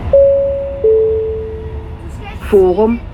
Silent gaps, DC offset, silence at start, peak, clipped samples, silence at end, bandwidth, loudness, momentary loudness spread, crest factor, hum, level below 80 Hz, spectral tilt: none; under 0.1%; 0 s; 0 dBFS; under 0.1%; 0 s; 12 kHz; -13 LUFS; 18 LU; 14 dB; none; -28 dBFS; -9 dB/octave